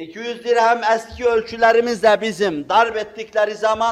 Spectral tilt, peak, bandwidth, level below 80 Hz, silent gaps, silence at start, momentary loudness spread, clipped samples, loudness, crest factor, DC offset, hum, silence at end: -3.5 dB/octave; -2 dBFS; 13 kHz; -52 dBFS; none; 0 s; 8 LU; under 0.1%; -18 LUFS; 16 dB; under 0.1%; none; 0 s